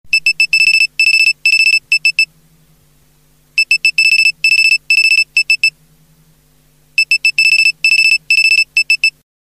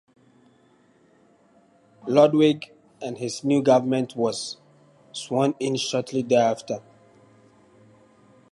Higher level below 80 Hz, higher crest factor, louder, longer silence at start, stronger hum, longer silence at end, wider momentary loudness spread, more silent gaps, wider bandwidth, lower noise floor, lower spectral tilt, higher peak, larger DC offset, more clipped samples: first, -58 dBFS vs -72 dBFS; second, 12 dB vs 22 dB; first, -9 LUFS vs -23 LUFS; second, 0.05 s vs 2.05 s; neither; second, 0.45 s vs 1.75 s; second, 6 LU vs 18 LU; neither; first, 14 kHz vs 11.5 kHz; second, -52 dBFS vs -59 dBFS; second, 3.5 dB/octave vs -5.5 dB/octave; first, 0 dBFS vs -4 dBFS; first, 0.1% vs under 0.1%; neither